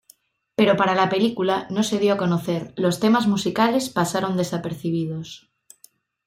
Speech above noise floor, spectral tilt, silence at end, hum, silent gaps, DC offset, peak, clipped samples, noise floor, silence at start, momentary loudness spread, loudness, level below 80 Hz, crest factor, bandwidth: 36 dB; -5.5 dB/octave; 0.9 s; none; none; under 0.1%; -4 dBFS; under 0.1%; -57 dBFS; 0.6 s; 9 LU; -21 LUFS; -62 dBFS; 18 dB; 16 kHz